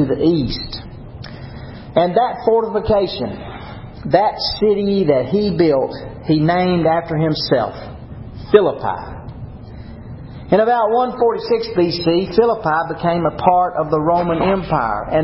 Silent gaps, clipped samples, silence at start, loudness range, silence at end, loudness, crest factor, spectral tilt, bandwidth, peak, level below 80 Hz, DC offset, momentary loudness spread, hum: none; under 0.1%; 0 s; 3 LU; 0 s; -17 LUFS; 18 dB; -10 dB/octave; 5.8 kHz; 0 dBFS; -38 dBFS; under 0.1%; 19 LU; none